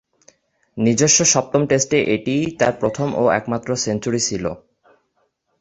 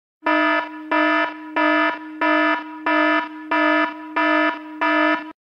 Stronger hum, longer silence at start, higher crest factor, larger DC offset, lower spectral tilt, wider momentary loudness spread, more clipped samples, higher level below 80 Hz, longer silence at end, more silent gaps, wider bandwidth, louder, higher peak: neither; first, 0.75 s vs 0.25 s; about the same, 18 dB vs 14 dB; neither; about the same, -3.5 dB/octave vs -3.5 dB/octave; first, 10 LU vs 6 LU; neither; first, -52 dBFS vs -76 dBFS; first, 1.05 s vs 0.25 s; neither; first, 8.4 kHz vs 6.6 kHz; about the same, -18 LUFS vs -19 LUFS; first, -2 dBFS vs -6 dBFS